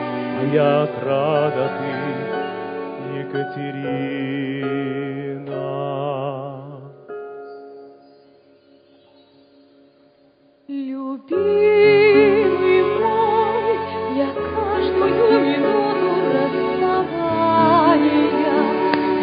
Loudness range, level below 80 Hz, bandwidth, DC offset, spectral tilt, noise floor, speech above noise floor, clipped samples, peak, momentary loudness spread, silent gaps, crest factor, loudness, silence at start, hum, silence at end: 15 LU; -52 dBFS; 5.2 kHz; under 0.1%; -11 dB/octave; -55 dBFS; 33 dB; under 0.1%; -2 dBFS; 15 LU; none; 18 dB; -19 LUFS; 0 s; none; 0 s